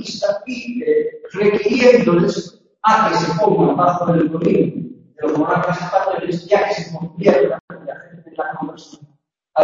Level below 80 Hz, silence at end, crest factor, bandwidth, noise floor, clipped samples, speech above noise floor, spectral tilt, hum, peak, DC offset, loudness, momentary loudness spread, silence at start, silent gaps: -56 dBFS; 0 s; 18 dB; 7.6 kHz; -60 dBFS; under 0.1%; 44 dB; -6.5 dB/octave; none; 0 dBFS; under 0.1%; -17 LUFS; 16 LU; 0 s; 7.60-7.68 s